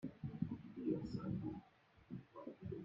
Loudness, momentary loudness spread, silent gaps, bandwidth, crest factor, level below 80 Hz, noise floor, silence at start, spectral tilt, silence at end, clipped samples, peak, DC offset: -47 LUFS; 12 LU; none; 7.6 kHz; 20 dB; -68 dBFS; -69 dBFS; 0 s; -9.5 dB/octave; 0 s; under 0.1%; -28 dBFS; under 0.1%